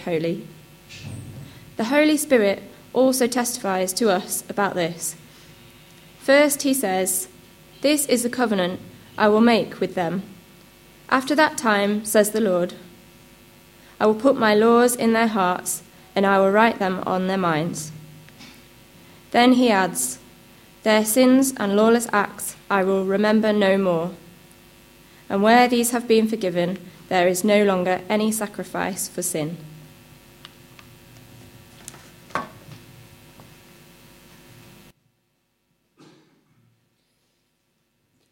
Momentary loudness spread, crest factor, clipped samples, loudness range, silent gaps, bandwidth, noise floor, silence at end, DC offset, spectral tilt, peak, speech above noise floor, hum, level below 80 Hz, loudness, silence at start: 16 LU; 20 dB; under 0.1%; 14 LU; none; 16.5 kHz; -70 dBFS; 5.55 s; under 0.1%; -4 dB/octave; -4 dBFS; 51 dB; none; -60 dBFS; -20 LUFS; 0 s